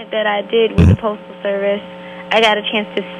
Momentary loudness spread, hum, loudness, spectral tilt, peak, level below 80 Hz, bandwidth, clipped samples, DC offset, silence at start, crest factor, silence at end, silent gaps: 12 LU; none; -16 LUFS; -6.5 dB/octave; 0 dBFS; -28 dBFS; 10 kHz; under 0.1%; under 0.1%; 0 s; 16 dB; 0 s; none